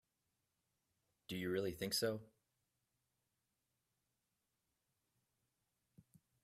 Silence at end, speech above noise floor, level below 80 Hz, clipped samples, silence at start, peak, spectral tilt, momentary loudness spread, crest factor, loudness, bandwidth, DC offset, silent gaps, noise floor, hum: 4.15 s; 47 dB; -78 dBFS; under 0.1%; 1.3 s; -26 dBFS; -4 dB/octave; 10 LU; 22 dB; -42 LUFS; 15.5 kHz; under 0.1%; none; -88 dBFS; none